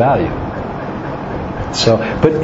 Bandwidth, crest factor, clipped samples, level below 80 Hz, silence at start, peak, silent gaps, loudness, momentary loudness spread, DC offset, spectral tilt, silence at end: 8 kHz; 16 dB; under 0.1%; -34 dBFS; 0 s; 0 dBFS; none; -18 LUFS; 10 LU; under 0.1%; -5.5 dB/octave; 0 s